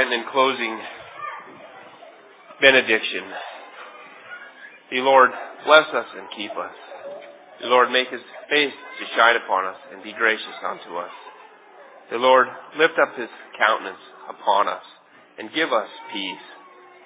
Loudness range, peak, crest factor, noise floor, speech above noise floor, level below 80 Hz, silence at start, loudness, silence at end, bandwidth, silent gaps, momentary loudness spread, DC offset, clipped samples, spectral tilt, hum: 3 LU; 0 dBFS; 22 dB; -47 dBFS; 26 dB; -76 dBFS; 0 s; -20 LUFS; 0.5 s; 4 kHz; none; 23 LU; under 0.1%; under 0.1%; -6 dB/octave; none